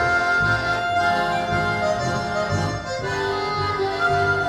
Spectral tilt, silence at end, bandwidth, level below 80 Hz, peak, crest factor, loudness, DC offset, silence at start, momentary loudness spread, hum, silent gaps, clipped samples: -5 dB/octave; 0 s; 13.5 kHz; -42 dBFS; -8 dBFS; 14 dB; -22 LUFS; under 0.1%; 0 s; 6 LU; none; none; under 0.1%